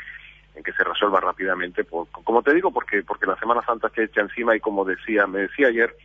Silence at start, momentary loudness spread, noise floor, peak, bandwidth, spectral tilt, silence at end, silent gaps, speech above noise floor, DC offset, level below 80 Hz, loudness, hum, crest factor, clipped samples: 0 s; 9 LU; -44 dBFS; -4 dBFS; 6 kHz; -6.5 dB/octave; 0.1 s; none; 22 dB; under 0.1%; -56 dBFS; -22 LUFS; none; 18 dB; under 0.1%